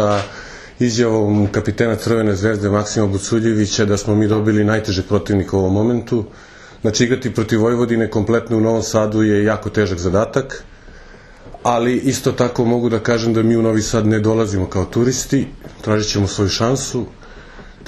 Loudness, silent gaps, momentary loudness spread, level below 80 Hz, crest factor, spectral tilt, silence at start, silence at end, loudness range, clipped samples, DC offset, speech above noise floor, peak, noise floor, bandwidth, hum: -17 LUFS; none; 6 LU; -40 dBFS; 16 dB; -5.5 dB/octave; 0 s; 0 s; 2 LU; under 0.1%; under 0.1%; 23 dB; 0 dBFS; -40 dBFS; 13 kHz; none